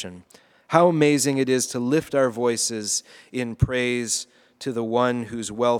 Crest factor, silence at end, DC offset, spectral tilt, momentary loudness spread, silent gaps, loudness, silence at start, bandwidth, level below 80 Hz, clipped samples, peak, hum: 22 dB; 0 s; under 0.1%; -4.5 dB/octave; 12 LU; none; -22 LUFS; 0 s; 18.5 kHz; -46 dBFS; under 0.1%; 0 dBFS; none